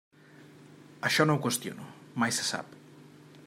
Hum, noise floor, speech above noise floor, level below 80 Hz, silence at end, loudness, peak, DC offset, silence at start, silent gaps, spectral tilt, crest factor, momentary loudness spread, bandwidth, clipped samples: none; -54 dBFS; 25 dB; -76 dBFS; 0 s; -29 LUFS; -10 dBFS; under 0.1%; 0.4 s; none; -3.5 dB/octave; 24 dB; 17 LU; 16 kHz; under 0.1%